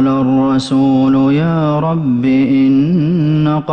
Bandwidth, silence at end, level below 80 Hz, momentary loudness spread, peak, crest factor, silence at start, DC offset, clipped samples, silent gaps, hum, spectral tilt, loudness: 8.8 kHz; 0 s; -46 dBFS; 3 LU; -4 dBFS; 8 dB; 0 s; under 0.1%; under 0.1%; none; none; -8.5 dB/octave; -12 LUFS